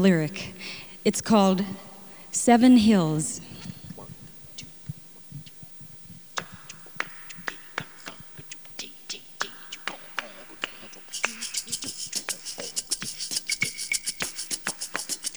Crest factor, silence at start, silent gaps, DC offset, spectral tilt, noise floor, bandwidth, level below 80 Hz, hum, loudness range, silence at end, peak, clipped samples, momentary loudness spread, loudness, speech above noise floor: 24 dB; 0 s; none; 0.2%; -4 dB/octave; -46 dBFS; over 20 kHz; -62 dBFS; none; 15 LU; 0 s; -4 dBFS; under 0.1%; 21 LU; -26 LUFS; 25 dB